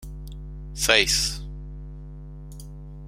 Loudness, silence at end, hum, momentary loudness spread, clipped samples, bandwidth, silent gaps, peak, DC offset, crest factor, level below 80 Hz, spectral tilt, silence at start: -20 LUFS; 0 s; 50 Hz at -35 dBFS; 24 LU; under 0.1%; 16.5 kHz; none; 0 dBFS; under 0.1%; 28 dB; -38 dBFS; -1.5 dB/octave; 0 s